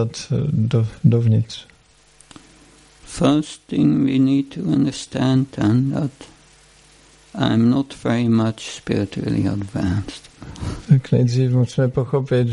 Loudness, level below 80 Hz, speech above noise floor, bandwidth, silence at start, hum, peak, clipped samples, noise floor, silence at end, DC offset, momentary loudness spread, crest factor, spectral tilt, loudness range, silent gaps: -19 LUFS; -46 dBFS; 35 dB; 11 kHz; 0 s; none; -2 dBFS; under 0.1%; -53 dBFS; 0 s; under 0.1%; 13 LU; 18 dB; -7.5 dB/octave; 3 LU; none